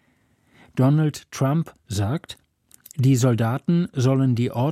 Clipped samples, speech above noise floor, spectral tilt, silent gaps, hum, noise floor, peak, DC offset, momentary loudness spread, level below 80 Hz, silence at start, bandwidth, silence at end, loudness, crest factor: under 0.1%; 42 dB; -7 dB/octave; none; none; -63 dBFS; -8 dBFS; under 0.1%; 12 LU; -58 dBFS; 0.75 s; 15.5 kHz; 0 s; -22 LUFS; 14 dB